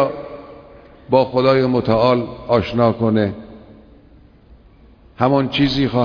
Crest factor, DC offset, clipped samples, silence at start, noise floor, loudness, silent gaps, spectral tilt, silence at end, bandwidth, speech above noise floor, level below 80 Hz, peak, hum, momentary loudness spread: 18 dB; under 0.1%; under 0.1%; 0 s; -47 dBFS; -17 LUFS; none; -8 dB/octave; 0 s; 5.4 kHz; 31 dB; -44 dBFS; 0 dBFS; none; 11 LU